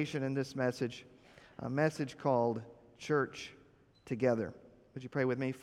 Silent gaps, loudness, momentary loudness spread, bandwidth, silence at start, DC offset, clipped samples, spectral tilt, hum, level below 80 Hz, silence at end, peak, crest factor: none; -35 LUFS; 17 LU; 13.5 kHz; 0 s; under 0.1%; under 0.1%; -6.5 dB/octave; none; -72 dBFS; 0 s; -18 dBFS; 18 dB